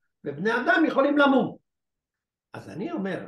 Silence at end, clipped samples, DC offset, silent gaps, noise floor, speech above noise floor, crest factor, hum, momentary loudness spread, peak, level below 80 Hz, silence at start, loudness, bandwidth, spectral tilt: 0 s; under 0.1%; under 0.1%; none; -88 dBFS; 65 dB; 18 dB; none; 17 LU; -8 dBFS; -72 dBFS; 0.25 s; -23 LUFS; 10 kHz; -6.5 dB/octave